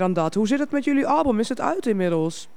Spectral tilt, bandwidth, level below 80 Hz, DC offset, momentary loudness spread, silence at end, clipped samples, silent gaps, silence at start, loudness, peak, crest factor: -6 dB/octave; 12 kHz; -54 dBFS; 1%; 4 LU; 0.1 s; under 0.1%; none; 0 s; -22 LUFS; -6 dBFS; 14 dB